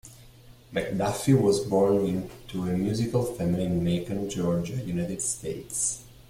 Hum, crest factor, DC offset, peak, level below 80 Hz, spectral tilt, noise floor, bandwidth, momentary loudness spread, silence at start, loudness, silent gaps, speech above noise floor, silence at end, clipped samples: none; 18 dB; under 0.1%; -10 dBFS; -52 dBFS; -5.5 dB/octave; -51 dBFS; 16 kHz; 10 LU; 0.05 s; -27 LUFS; none; 25 dB; 0.2 s; under 0.1%